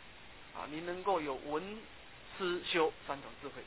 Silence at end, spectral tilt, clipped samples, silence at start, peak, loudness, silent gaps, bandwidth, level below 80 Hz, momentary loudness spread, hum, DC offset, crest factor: 0 s; -2 dB/octave; under 0.1%; 0 s; -18 dBFS; -38 LUFS; none; 4 kHz; -64 dBFS; 19 LU; none; 0.1%; 22 dB